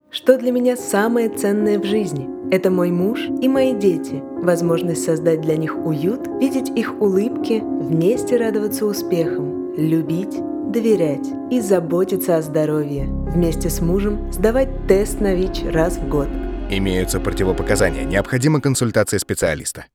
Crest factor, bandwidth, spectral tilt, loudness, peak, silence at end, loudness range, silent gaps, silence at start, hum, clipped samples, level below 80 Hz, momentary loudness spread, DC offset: 18 dB; 19 kHz; -6 dB/octave; -19 LUFS; 0 dBFS; 0.1 s; 1 LU; none; 0.15 s; none; under 0.1%; -32 dBFS; 5 LU; under 0.1%